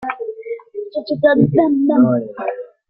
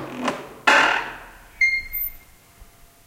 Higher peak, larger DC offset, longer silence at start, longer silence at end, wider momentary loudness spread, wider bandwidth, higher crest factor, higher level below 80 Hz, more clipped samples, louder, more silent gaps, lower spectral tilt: about the same, -2 dBFS vs 0 dBFS; neither; about the same, 0 s vs 0 s; second, 0.25 s vs 0.4 s; about the same, 14 LU vs 14 LU; second, 5.2 kHz vs 16.5 kHz; second, 14 dB vs 24 dB; second, -54 dBFS vs -48 dBFS; neither; first, -16 LUFS vs -20 LUFS; neither; first, -11 dB/octave vs -2 dB/octave